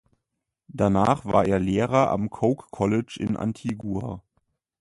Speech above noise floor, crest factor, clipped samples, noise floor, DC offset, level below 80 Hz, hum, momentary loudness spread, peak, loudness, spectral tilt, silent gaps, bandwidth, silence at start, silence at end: 59 dB; 20 dB; under 0.1%; -82 dBFS; under 0.1%; -48 dBFS; none; 10 LU; -6 dBFS; -24 LUFS; -7.5 dB/octave; none; 11.5 kHz; 0.75 s; 0.6 s